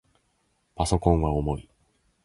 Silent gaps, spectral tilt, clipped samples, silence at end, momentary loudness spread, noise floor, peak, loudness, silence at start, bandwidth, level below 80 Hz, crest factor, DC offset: none; -7 dB/octave; under 0.1%; 0.65 s; 9 LU; -71 dBFS; -6 dBFS; -26 LUFS; 0.8 s; 11.5 kHz; -36 dBFS; 22 dB; under 0.1%